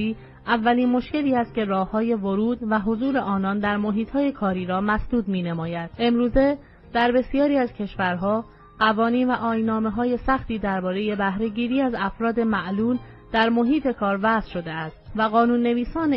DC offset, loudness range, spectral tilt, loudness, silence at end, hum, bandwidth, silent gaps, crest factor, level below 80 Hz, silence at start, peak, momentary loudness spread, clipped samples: under 0.1%; 1 LU; -9 dB/octave; -23 LUFS; 0 s; none; 5.8 kHz; none; 16 dB; -42 dBFS; 0 s; -6 dBFS; 6 LU; under 0.1%